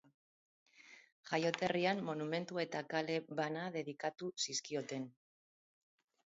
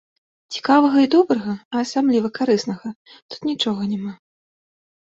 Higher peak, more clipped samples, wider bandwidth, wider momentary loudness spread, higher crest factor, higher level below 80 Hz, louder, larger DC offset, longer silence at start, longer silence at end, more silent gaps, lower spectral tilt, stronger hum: second, -18 dBFS vs -2 dBFS; neither; about the same, 7.6 kHz vs 7.8 kHz; about the same, 14 LU vs 16 LU; first, 24 dB vs 18 dB; second, -84 dBFS vs -66 dBFS; second, -39 LUFS vs -19 LUFS; neither; first, 0.8 s vs 0.5 s; first, 1.2 s vs 0.9 s; second, 1.12-1.23 s vs 1.65-1.71 s, 2.96-3.05 s, 3.22-3.29 s; second, -3.5 dB/octave vs -5.5 dB/octave; neither